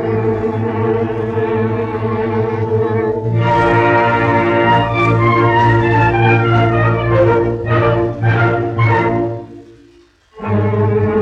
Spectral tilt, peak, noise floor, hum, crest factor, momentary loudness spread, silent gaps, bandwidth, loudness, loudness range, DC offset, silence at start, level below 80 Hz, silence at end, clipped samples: -8.5 dB/octave; -2 dBFS; -48 dBFS; none; 12 dB; 6 LU; none; 6.4 kHz; -14 LUFS; 5 LU; under 0.1%; 0 s; -36 dBFS; 0 s; under 0.1%